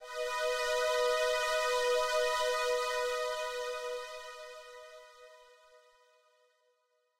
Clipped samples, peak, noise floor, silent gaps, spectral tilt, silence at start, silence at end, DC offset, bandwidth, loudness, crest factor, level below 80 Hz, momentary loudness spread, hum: under 0.1%; -20 dBFS; -76 dBFS; none; 2 dB/octave; 0 s; 1.75 s; under 0.1%; 16 kHz; -32 LUFS; 14 dB; -64 dBFS; 18 LU; none